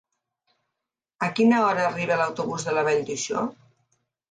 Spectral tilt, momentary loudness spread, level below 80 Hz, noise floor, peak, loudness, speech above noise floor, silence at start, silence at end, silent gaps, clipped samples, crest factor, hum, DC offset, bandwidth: -4.5 dB/octave; 9 LU; -70 dBFS; -85 dBFS; -8 dBFS; -24 LUFS; 62 dB; 1.2 s; 0.8 s; none; under 0.1%; 16 dB; none; under 0.1%; 9.4 kHz